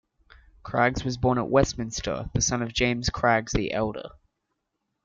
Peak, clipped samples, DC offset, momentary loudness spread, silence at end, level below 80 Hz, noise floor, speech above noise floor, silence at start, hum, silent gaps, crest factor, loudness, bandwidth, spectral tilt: -6 dBFS; under 0.1%; under 0.1%; 8 LU; 0.95 s; -42 dBFS; -80 dBFS; 55 dB; 0.65 s; none; none; 20 dB; -25 LUFS; 9.2 kHz; -4.5 dB/octave